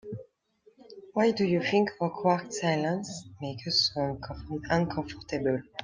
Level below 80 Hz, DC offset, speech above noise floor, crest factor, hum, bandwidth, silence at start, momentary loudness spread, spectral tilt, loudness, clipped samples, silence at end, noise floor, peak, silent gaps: -56 dBFS; under 0.1%; 35 dB; 20 dB; none; 9.8 kHz; 0.05 s; 13 LU; -5 dB/octave; -29 LUFS; under 0.1%; 0 s; -64 dBFS; -10 dBFS; none